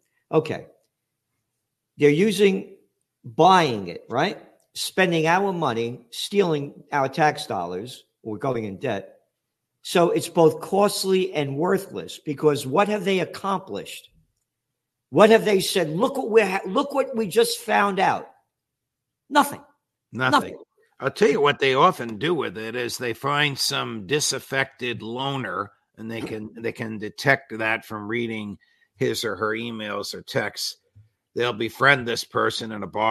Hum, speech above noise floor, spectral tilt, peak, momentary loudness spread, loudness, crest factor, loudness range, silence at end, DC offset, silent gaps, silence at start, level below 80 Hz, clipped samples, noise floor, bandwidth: none; 60 dB; -4.5 dB/octave; 0 dBFS; 14 LU; -23 LUFS; 22 dB; 6 LU; 0 s; under 0.1%; none; 0.3 s; -68 dBFS; under 0.1%; -82 dBFS; 13.5 kHz